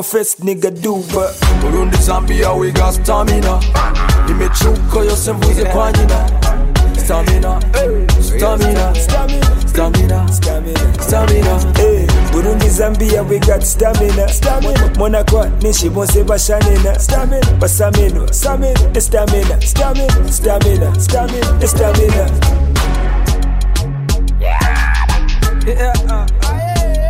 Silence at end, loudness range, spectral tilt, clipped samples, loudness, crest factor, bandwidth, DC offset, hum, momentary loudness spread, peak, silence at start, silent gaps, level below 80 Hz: 0 s; 2 LU; -5 dB/octave; under 0.1%; -13 LUFS; 10 dB; 16.5 kHz; under 0.1%; none; 4 LU; 0 dBFS; 0 s; none; -12 dBFS